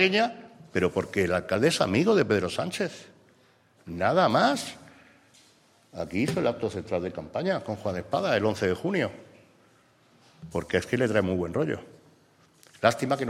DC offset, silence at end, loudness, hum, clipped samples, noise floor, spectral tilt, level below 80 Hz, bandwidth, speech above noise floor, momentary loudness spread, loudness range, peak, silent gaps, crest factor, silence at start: under 0.1%; 0 s; -27 LUFS; none; under 0.1%; -61 dBFS; -5.5 dB/octave; -60 dBFS; 15.5 kHz; 35 dB; 11 LU; 5 LU; -6 dBFS; none; 22 dB; 0 s